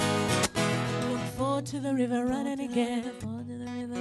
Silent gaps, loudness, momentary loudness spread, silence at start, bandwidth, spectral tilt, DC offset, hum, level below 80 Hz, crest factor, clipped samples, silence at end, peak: none; -30 LUFS; 11 LU; 0 s; 12 kHz; -5 dB/octave; under 0.1%; none; -56 dBFS; 16 dB; under 0.1%; 0 s; -14 dBFS